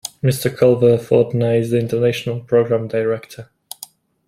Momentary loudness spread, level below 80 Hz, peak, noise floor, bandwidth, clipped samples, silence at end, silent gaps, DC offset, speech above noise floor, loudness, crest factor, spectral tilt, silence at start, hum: 20 LU; -56 dBFS; -2 dBFS; -42 dBFS; 16 kHz; under 0.1%; 0.85 s; none; under 0.1%; 25 dB; -17 LUFS; 16 dB; -6.5 dB/octave; 0.05 s; none